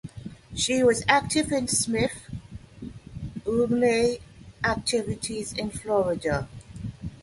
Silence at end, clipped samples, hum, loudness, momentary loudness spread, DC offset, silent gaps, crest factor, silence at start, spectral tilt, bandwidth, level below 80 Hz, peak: 0 s; under 0.1%; none; -25 LUFS; 19 LU; under 0.1%; none; 22 dB; 0.05 s; -4 dB/octave; 12 kHz; -48 dBFS; -6 dBFS